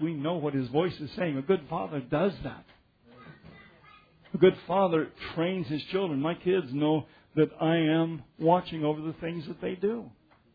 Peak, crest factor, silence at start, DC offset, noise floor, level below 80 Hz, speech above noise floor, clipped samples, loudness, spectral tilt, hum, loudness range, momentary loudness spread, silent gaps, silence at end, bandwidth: -8 dBFS; 20 dB; 0 s; under 0.1%; -57 dBFS; -60 dBFS; 29 dB; under 0.1%; -29 LUFS; -9.5 dB/octave; none; 4 LU; 11 LU; none; 0.45 s; 5 kHz